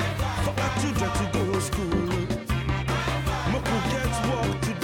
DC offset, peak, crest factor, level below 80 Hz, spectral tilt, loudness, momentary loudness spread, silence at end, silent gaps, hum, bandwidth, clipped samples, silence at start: under 0.1%; -14 dBFS; 12 dB; -36 dBFS; -5.5 dB/octave; -26 LUFS; 2 LU; 0 s; none; none; 18 kHz; under 0.1%; 0 s